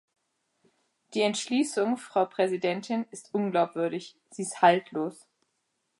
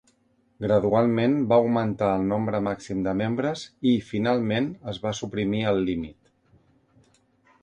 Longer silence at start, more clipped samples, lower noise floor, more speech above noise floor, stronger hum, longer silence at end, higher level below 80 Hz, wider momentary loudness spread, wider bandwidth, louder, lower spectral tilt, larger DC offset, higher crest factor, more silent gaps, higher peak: first, 1.1 s vs 0.6 s; neither; first, -78 dBFS vs -66 dBFS; first, 50 dB vs 42 dB; neither; second, 0.85 s vs 1.5 s; second, -82 dBFS vs -54 dBFS; first, 13 LU vs 9 LU; first, 11.5 kHz vs 9.8 kHz; second, -28 LUFS vs -25 LUFS; second, -4.5 dB/octave vs -7 dB/octave; neither; about the same, 22 dB vs 18 dB; neither; about the same, -8 dBFS vs -8 dBFS